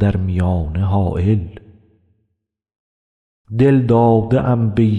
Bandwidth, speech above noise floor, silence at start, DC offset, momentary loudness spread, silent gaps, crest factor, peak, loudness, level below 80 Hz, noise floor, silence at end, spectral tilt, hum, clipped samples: 4.5 kHz; 60 dB; 0 s; under 0.1%; 7 LU; 2.79-3.45 s; 14 dB; -4 dBFS; -16 LUFS; -38 dBFS; -75 dBFS; 0 s; -10 dB/octave; none; under 0.1%